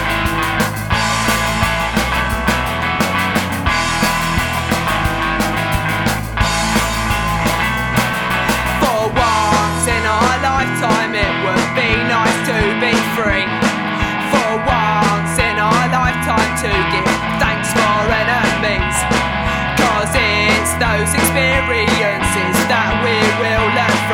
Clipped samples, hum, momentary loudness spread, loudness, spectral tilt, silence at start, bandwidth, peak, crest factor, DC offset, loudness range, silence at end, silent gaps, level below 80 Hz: under 0.1%; none; 3 LU; -15 LUFS; -4 dB/octave; 0 s; over 20 kHz; -2 dBFS; 14 dB; under 0.1%; 2 LU; 0 s; none; -28 dBFS